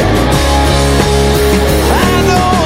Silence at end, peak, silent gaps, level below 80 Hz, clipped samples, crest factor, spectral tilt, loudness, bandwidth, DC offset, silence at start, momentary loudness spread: 0 s; 0 dBFS; none; -16 dBFS; under 0.1%; 10 dB; -5 dB/octave; -10 LUFS; 16.5 kHz; under 0.1%; 0 s; 1 LU